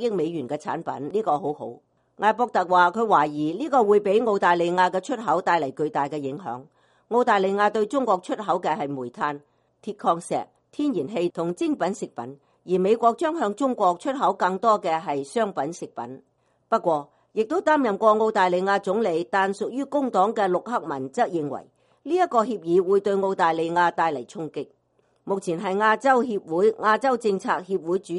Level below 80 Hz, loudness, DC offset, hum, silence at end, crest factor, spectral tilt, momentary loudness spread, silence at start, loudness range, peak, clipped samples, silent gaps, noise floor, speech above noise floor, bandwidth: -72 dBFS; -23 LUFS; under 0.1%; none; 0 s; 20 dB; -5.5 dB/octave; 12 LU; 0 s; 5 LU; -4 dBFS; under 0.1%; none; -64 dBFS; 41 dB; 11.5 kHz